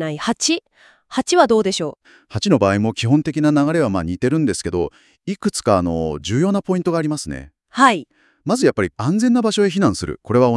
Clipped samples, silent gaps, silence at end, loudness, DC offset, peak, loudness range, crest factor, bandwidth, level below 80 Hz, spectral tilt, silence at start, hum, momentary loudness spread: under 0.1%; none; 0 s; -18 LUFS; under 0.1%; 0 dBFS; 2 LU; 18 dB; 12 kHz; -48 dBFS; -5.5 dB/octave; 0 s; none; 11 LU